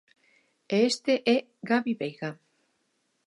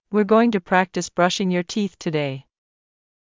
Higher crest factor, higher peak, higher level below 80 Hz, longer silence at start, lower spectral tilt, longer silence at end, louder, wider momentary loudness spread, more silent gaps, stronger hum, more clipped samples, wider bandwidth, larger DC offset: about the same, 18 dB vs 18 dB; second, -10 dBFS vs -4 dBFS; second, -82 dBFS vs -62 dBFS; first, 0.7 s vs 0.1 s; about the same, -4.5 dB/octave vs -5.5 dB/octave; about the same, 0.9 s vs 0.95 s; second, -27 LUFS vs -21 LUFS; about the same, 10 LU vs 9 LU; neither; neither; neither; first, 11.5 kHz vs 7.6 kHz; neither